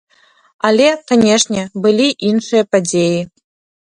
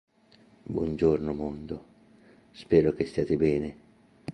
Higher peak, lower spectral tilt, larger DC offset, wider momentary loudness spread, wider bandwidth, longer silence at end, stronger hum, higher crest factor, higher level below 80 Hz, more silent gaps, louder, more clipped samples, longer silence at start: first, 0 dBFS vs -8 dBFS; second, -4 dB/octave vs -8.5 dB/octave; neither; second, 6 LU vs 18 LU; first, 10.5 kHz vs 9.4 kHz; first, 0.7 s vs 0 s; neither; second, 14 dB vs 20 dB; second, -56 dBFS vs -50 dBFS; neither; first, -14 LUFS vs -27 LUFS; neither; about the same, 0.65 s vs 0.7 s